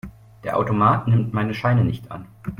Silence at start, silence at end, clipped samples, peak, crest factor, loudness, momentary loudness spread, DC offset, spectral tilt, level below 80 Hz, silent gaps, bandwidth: 0.05 s; 0.05 s; under 0.1%; -4 dBFS; 18 dB; -20 LUFS; 16 LU; under 0.1%; -9 dB/octave; -48 dBFS; none; 5.6 kHz